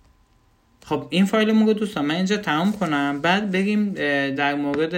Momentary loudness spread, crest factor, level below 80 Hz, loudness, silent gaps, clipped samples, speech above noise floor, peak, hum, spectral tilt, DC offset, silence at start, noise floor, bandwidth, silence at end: 5 LU; 16 dB; -60 dBFS; -21 LUFS; none; under 0.1%; 39 dB; -6 dBFS; none; -6 dB/octave; under 0.1%; 0.85 s; -59 dBFS; 16 kHz; 0 s